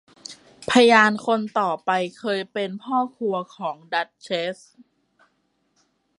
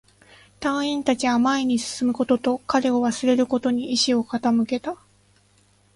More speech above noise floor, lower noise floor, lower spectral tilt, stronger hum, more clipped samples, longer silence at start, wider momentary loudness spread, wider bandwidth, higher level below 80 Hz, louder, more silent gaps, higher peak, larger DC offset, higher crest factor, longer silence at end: first, 47 dB vs 38 dB; first, -69 dBFS vs -59 dBFS; about the same, -4 dB/octave vs -3.5 dB/octave; second, none vs 50 Hz at -55 dBFS; neither; second, 0.3 s vs 0.6 s; first, 19 LU vs 6 LU; about the same, 11.5 kHz vs 11.5 kHz; second, -68 dBFS vs -60 dBFS; about the same, -22 LUFS vs -22 LUFS; neither; first, -2 dBFS vs -6 dBFS; neither; about the same, 22 dB vs 18 dB; first, 1.65 s vs 1 s